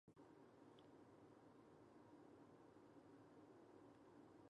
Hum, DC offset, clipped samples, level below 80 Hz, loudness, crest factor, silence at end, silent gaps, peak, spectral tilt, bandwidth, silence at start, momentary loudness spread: none; under 0.1%; under 0.1%; under -90 dBFS; -68 LUFS; 14 dB; 0 s; none; -54 dBFS; -6.5 dB/octave; 9 kHz; 0.05 s; 1 LU